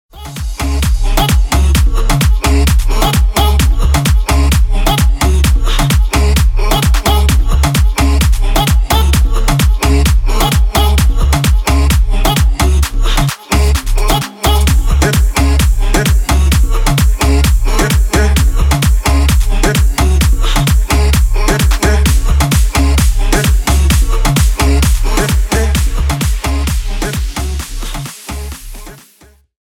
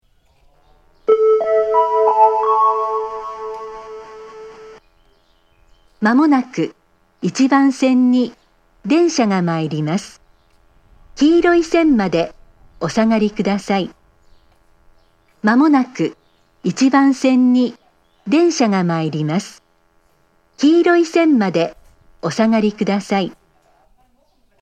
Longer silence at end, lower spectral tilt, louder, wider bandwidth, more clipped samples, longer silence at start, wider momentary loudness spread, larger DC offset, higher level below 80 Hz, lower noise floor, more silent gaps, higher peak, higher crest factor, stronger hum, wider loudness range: second, 0.65 s vs 1.3 s; second, -4.5 dB/octave vs -6 dB/octave; first, -12 LUFS vs -16 LUFS; first, 17.5 kHz vs 9.4 kHz; neither; second, 0.15 s vs 1.1 s; second, 4 LU vs 15 LU; neither; first, -12 dBFS vs -52 dBFS; second, -45 dBFS vs -58 dBFS; neither; about the same, 0 dBFS vs 0 dBFS; second, 10 dB vs 16 dB; neither; second, 2 LU vs 5 LU